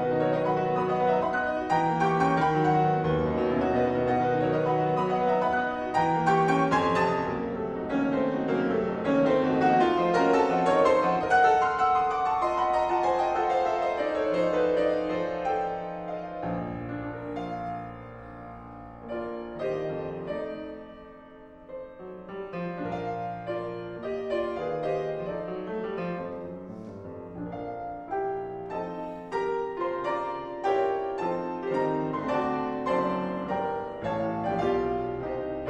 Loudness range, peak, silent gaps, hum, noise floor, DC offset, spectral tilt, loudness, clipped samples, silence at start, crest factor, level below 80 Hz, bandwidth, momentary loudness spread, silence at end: 12 LU; -10 dBFS; none; none; -48 dBFS; under 0.1%; -7 dB/octave; -27 LUFS; under 0.1%; 0 s; 18 dB; -54 dBFS; 9.6 kHz; 14 LU; 0 s